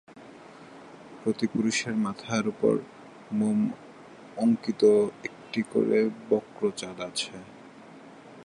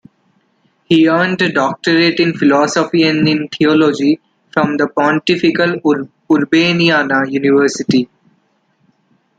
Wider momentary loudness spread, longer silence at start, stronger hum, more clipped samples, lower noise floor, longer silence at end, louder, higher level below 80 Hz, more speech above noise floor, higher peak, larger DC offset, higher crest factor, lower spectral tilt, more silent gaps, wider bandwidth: first, 24 LU vs 5 LU; second, 0.15 s vs 0.9 s; neither; neither; second, -48 dBFS vs -59 dBFS; second, 0 s vs 1.35 s; second, -27 LUFS vs -13 LUFS; second, -70 dBFS vs -56 dBFS; second, 22 dB vs 47 dB; second, -10 dBFS vs 0 dBFS; neither; about the same, 18 dB vs 14 dB; about the same, -5 dB/octave vs -5.5 dB/octave; neither; first, 11 kHz vs 9 kHz